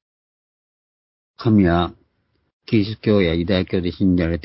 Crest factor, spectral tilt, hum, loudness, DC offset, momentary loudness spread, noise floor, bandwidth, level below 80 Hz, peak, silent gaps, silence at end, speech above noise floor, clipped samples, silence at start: 16 dB; -12 dB/octave; none; -19 LUFS; under 0.1%; 7 LU; -68 dBFS; 5.8 kHz; -36 dBFS; -4 dBFS; 2.53-2.60 s; 0.05 s; 50 dB; under 0.1%; 1.4 s